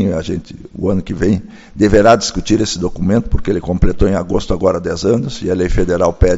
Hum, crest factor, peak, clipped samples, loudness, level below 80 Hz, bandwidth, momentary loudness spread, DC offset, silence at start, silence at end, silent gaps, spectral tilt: none; 14 dB; 0 dBFS; under 0.1%; -15 LUFS; -24 dBFS; 8 kHz; 9 LU; under 0.1%; 0 s; 0 s; none; -6 dB/octave